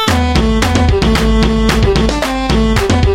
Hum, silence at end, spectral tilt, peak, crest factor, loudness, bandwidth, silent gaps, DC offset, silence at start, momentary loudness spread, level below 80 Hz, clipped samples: none; 0 s; -5.5 dB/octave; 0 dBFS; 10 dB; -12 LUFS; 16 kHz; none; under 0.1%; 0 s; 2 LU; -16 dBFS; under 0.1%